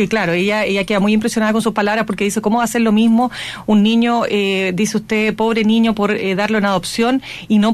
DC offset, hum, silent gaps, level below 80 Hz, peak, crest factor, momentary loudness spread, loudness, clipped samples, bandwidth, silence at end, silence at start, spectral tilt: under 0.1%; none; none; -48 dBFS; -4 dBFS; 12 dB; 4 LU; -16 LUFS; under 0.1%; 14 kHz; 0 s; 0 s; -5 dB/octave